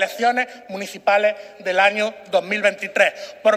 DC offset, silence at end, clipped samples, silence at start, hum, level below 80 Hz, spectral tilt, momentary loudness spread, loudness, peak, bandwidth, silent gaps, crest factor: under 0.1%; 0 s; under 0.1%; 0 s; none; -76 dBFS; -3 dB/octave; 10 LU; -20 LUFS; -2 dBFS; 15.5 kHz; none; 18 dB